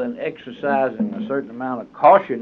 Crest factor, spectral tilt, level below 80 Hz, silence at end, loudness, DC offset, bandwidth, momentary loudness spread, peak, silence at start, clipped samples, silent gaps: 18 dB; -8.5 dB/octave; -66 dBFS; 0 s; -20 LUFS; under 0.1%; 4.9 kHz; 14 LU; -2 dBFS; 0 s; under 0.1%; none